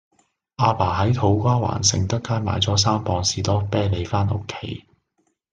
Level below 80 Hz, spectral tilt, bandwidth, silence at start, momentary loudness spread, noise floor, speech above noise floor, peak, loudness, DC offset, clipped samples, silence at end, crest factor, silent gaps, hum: -50 dBFS; -4.5 dB/octave; 9.4 kHz; 0.6 s; 8 LU; -70 dBFS; 49 dB; -2 dBFS; -21 LUFS; under 0.1%; under 0.1%; 0.75 s; 18 dB; none; none